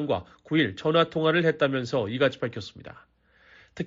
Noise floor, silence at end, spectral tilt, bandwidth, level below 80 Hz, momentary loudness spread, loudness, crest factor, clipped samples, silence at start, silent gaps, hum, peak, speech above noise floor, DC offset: -57 dBFS; 0 s; -4 dB/octave; 7.6 kHz; -62 dBFS; 12 LU; -25 LUFS; 18 dB; under 0.1%; 0 s; none; none; -8 dBFS; 31 dB; under 0.1%